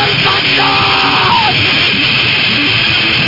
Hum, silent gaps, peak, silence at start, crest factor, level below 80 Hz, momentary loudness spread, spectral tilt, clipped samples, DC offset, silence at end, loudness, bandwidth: none; none; 0 dBFS; 0 s; 10 dB; -40 dBFS; 0 LU; -4 dB/octave; under 0.1%; under 0.1%; 0 s; -8 LUFS; 5.8 kHz